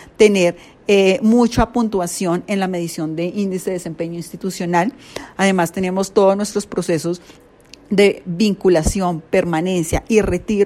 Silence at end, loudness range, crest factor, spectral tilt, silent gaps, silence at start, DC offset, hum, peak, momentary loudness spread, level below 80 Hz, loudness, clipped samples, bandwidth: 0 s; 4 LU; 18 dB; -5.5 dB/octave; none; 0 s; under 0.1%; none; 0 dBFS; 11 LU; -36 dBFS; -18 LUFS; under 0.1%; 15.5 kHz